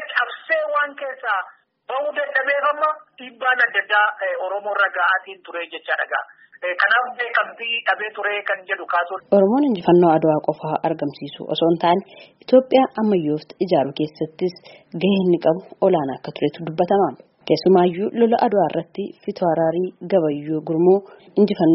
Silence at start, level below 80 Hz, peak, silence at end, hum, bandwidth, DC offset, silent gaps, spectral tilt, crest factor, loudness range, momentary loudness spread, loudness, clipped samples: 0 s; -66 dBFS; -2 dBFS; 0 s; none; 5.8 kHz; under 0.1%; none; -4 dB/octave; 18 dB; 3 LU; 11 LU; -20 LUFS; under 0.1%